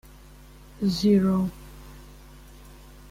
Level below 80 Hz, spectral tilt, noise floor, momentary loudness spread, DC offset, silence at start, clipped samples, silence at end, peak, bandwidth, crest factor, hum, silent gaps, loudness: -48 dBFS; -7 dB/octave; -48 dBFS; 26 LU; under 0.1%; 0.8 s; under 0.1%; 0.4 s; -10 dBFS; 15.5 kHz; 18 dB; 50 Hz at -40 dBFS; none; -24 LUFS